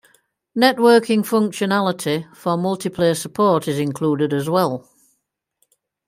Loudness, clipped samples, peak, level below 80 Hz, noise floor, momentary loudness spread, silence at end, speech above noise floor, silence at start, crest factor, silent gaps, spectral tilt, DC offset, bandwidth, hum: -19 LUFS; under 0.1%; 0 dBFS; -62 dBFS; -73 dBFS; 9 LU; 1.3 s; 55 dB; 0.55 s; 18 dB; none; -5.5 dB/octave; under 0.1%; 16 kHz; none